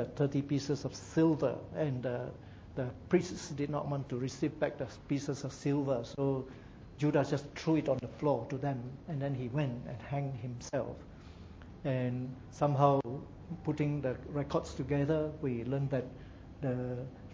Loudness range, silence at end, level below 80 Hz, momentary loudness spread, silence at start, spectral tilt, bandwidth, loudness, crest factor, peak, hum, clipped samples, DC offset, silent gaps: 4 LU; 0 s; -56 dBFS; 13 LU; 0 s; -7.5 dB/octave; 8 kHz; -35 LUFS; 22 dB; -12 dBFS; none; under 0.1%; under 0.1%; none